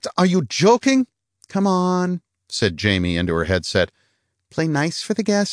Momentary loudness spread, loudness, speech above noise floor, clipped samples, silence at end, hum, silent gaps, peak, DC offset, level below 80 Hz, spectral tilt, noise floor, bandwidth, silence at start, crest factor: 10 LU; -20 LUFS; 49 dB; under 0.1%; 0 s; none; none; -4 dBFS; under 0.1%; -46 dBFS; -5 dB/octave; -68 dBFS; 10.5 kHz; 0 s; 16 dB